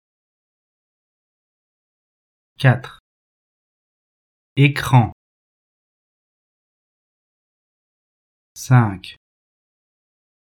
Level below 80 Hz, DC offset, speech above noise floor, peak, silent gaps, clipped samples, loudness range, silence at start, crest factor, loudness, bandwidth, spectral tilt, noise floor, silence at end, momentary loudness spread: -56 dBFS; under 0.1%; over 74 dB; 0 dBFS; 3.00-4.56 s, 5.12-8.55 s; under 0.1%; 5 LU; 2.6 s; 24 dB; -17 LUFS; 13.5 kHz; -6.5 dB/octave; under -90 dBFS; 1.35 s; 18 LU